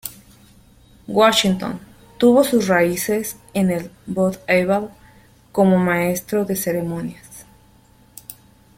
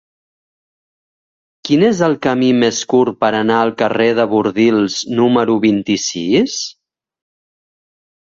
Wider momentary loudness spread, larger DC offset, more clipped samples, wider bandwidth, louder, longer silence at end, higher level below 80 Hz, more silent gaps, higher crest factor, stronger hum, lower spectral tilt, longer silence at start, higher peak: first, 20 LU vs 4 LU; neither; neither; first, 16.5 kHz vs 7.8 kHz; second, -19 LUFS vs -14 LUFS; second, 0.45 s vs 1.55 s; about the same, -52 dBFS vs -56 dBFS; neither; about the same, 18 dB vs 14 dB; neither; about the same, -5 dB/octave vs -4.5 dB/octave; second, 0.05 s vs 1.65 s; about the same, -2 dBFS vs -2 dBFS